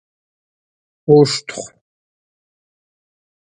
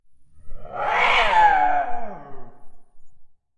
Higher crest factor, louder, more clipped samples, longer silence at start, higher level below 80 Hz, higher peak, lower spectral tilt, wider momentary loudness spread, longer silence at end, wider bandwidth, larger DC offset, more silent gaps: about the same, 20 dB vs 18 dB; first, -14 LUFS vs -19 LUFS; neither; first, 1.1 s vs 0.1 s; second, -62 dBFS vs -40 dBFS; first, 0 dBFS vs -4 dBFS; first, -5.5 dB/octave vs -2.5 dB/octave; about the same, 20 LU vs 21 LU; first, 1.75 s vs 0.3 s; about the same, 10 kHz vs 9.2 kHz; neither; neither